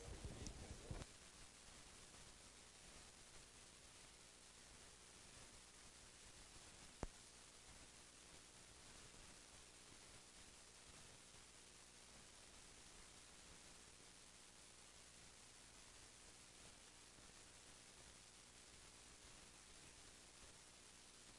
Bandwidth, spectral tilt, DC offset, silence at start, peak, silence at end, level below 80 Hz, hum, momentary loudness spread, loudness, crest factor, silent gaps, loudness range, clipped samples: 12 kHz; -2.5 dB/octave; under 0.1%; 0 s; -30 dBFS; 0 s; -70 dBFS; 60 Hz at -75 dBFS; 6 LU; -61 LUFS; 34 dB; none; 2 LU; under 0.1%